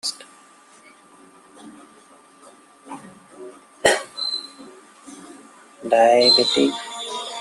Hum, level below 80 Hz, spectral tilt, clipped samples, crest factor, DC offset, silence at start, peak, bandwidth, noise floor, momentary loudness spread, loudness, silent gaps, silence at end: none; -66 dBFS; -2 dB/octave; under 0.1%; 20 dB; under 0.1%; 0.05 s; -2 dBFS; 13 kHz; -50 dBFS; 28 LU; -18 LUFS; none; 0 s